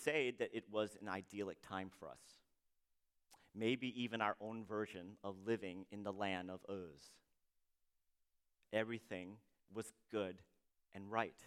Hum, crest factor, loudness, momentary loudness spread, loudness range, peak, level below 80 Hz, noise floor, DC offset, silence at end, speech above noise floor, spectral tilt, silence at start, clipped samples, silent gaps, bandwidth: none; 26 dB; -45 LUFS; 16 LU; 5 LU; -20 dBFS; -84 dBFS; -83 dBFS; under 0.1%; 0 s; 38 dB; -5 dB/octave; 0 s; under 0.1%; none; 15.5 kHz